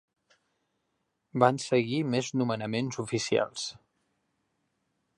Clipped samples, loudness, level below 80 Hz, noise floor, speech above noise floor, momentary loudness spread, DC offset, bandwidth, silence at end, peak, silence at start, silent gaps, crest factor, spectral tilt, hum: under 0.1%; -29 LUFS; -72 dBFS; -79 dBFS; 51 dB; 10 LU; under 0.1%; 11.5 kHz; 1.45 s; -6 dBFS; 1.35 s; none; 24 dB; -5 dB/octave; none